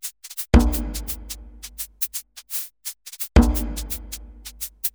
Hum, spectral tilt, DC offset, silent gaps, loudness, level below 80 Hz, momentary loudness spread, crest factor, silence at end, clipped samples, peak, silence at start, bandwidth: none; -5 dB/octave; under 0.1%; none; -24 LUFS; -26 dBFS; 17 LU; 24 dB; 0.05 s; under 0.1%; 0 dBFS; 0.05 s; over 20 kHz